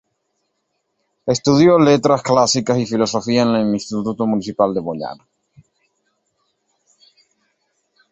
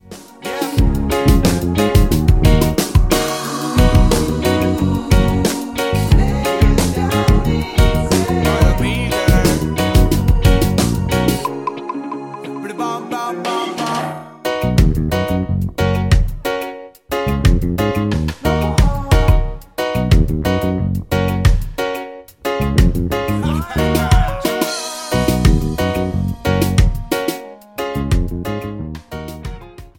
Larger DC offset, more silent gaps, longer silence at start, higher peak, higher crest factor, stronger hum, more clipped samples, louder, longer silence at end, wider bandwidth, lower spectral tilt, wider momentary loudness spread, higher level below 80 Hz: neither; neither; first, 1.25 s vs 0.1 s; about the same, -2 dBFS vs 0 dBFS; about the same, 18 dB vs 14 dB; neither; neither; about the same, -16 LUFS vs -17 LUFS; first, 3 s vs 0.1 s; second, 8.4 kHz vs 17 kHz; about the same, -5.5 dB/octave vs -6 dB/octave; about the same, 12 LU vs 11 LU; second, -56 dBFS vs -20 dBFS